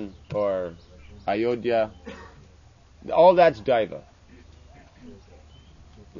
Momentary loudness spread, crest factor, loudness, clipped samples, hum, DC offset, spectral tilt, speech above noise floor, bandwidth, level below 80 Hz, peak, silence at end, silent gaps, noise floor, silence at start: 26 LU; 22 dB; -22 LUFS; under 0.1%; none; under 0.1%; -7 dB/octave; 31 dB; 7.2 kHz; -52 dBFS; -4 dBFS; 0 s; none; -52 dBFS; 0 s